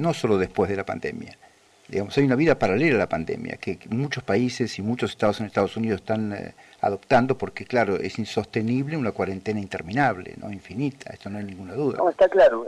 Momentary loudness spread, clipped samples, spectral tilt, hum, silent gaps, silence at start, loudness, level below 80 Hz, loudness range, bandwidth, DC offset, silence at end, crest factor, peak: 14 LU; under 0.1%; -6.5 dB/octave; none; none; 0 s; -24 LUFS; -54 dBFS; 4 LU; 12.5 kHz; under 0.1%; 0 s; 16 dB; -8 dBFS